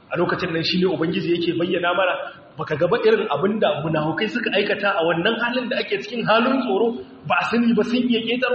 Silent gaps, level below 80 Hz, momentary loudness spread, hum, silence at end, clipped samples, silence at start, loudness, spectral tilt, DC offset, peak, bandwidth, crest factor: none; -60 dBFS; 5 LU; none; 0 s; under 0.1%; 0.1 s; -21 LUFS; -3.5 dB/octave; under 0.1%; -4 dBFS; 6.6 kHz; 16 dB